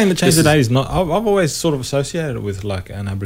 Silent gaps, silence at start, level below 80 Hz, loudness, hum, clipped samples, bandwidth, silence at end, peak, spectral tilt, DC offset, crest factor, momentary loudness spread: none; 0 s; -36 dBFS; -17 LUFS; none; under 0.1%; 16 kHz; 0 s; 0 dBFS; -5 dB/octave; under 0.1%; 16 dB; 12 LU